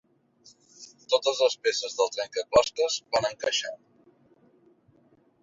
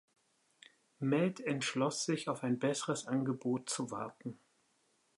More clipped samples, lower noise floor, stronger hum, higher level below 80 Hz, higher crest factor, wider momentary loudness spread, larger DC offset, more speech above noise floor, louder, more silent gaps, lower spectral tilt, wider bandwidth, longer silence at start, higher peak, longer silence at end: neither; second, -63 dBFS vs -75 dBFS; neither; first, -62 dBFS vs -84 dBFS; about the same, 22 dB vs 18 dB; first, 22 LU vs 9 LU; neither; about the same, 37 dB vs 40 dB; first, -26 LUFS vs -36 LUFS; neither; second, -1 dB/octave vs -4.5 dB/octave; second, 7.8 kHz vs 11.5 kHz; second, 0.8 s vs 1 s; first, -6 dBFS vs -20 dBFS; first, 1.65 s vs 0.85 s